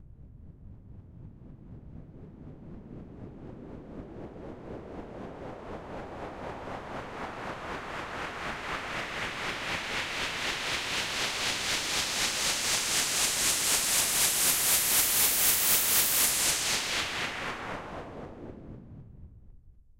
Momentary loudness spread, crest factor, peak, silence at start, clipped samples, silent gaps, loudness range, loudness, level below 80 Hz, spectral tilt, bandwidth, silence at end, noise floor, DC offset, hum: 24 LU; 20 dB; -10 dBFS; 0 s; under 0.1%; none; 22 LU; -26 LUFS; -52 dBFS; -0.5 dB/octave; 16 kHz; 0.25 s; -53 dBFS; under 0.1%; none